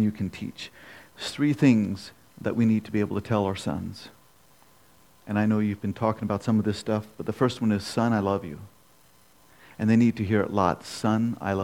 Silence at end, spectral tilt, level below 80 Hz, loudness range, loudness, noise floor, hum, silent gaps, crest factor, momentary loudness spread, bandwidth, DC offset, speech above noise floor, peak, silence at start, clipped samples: 0 s; -7 dB/octave; -62 dBFS; 3 LU; -26 LUFS; -59 dBFS; none; none; 20 dB; 16 LU; 15.5 kHz; under 0.1%; 34 dB; -8 dBFS; 0 s; under 0.1%